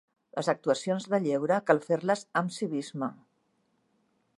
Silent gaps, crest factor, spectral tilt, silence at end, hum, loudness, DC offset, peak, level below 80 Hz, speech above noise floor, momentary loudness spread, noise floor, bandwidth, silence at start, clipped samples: none; 24 dB; -5.5 dB/octave; 1.25 s; none; -29 LUFS; under 0.1%; -6 dBFS; -82 dBFS; 45 dB; 10 LU; -73 dBFS; 11.5 kHz; 0.35 s; under 0.1%